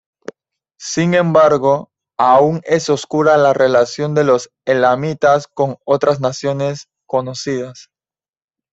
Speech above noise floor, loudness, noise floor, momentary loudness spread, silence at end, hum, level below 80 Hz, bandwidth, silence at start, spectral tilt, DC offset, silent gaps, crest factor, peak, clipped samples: over 76 dB; -15 LUFS; under -90 dBFS; 12 LU; 0.9 s; none; -58 dBFS; 8 kHz; 0.8 s; -5.5 dB/octave; under 0.1%; none; 14 dB; -2 dBFS; under 0.1%